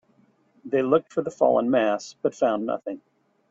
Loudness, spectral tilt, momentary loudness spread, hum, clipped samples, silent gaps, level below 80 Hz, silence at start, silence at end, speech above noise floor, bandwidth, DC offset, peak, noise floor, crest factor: -24 LUFS; -6 dB/octave; 10 LU; none; under 0.1%; none; -70 dBFS; 0.65 s; 0.55 s; 39 dB; 7.8 kHz; under 0.1%; -8 dBFS; -62 dBFS; 18 dB